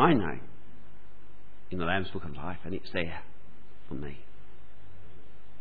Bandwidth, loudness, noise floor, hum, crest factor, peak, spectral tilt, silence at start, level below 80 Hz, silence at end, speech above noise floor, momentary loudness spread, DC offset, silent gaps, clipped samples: 4.9 kHz; -34 LUFS; -57 dBFS; 50 Hz at -60 dBFS; 24 dB; -10 dBFS; -9 dB/octave; 0 s; -56 dBFS; 0.4 s; 25 dB; 25 LU; 3%; none; under 0.1%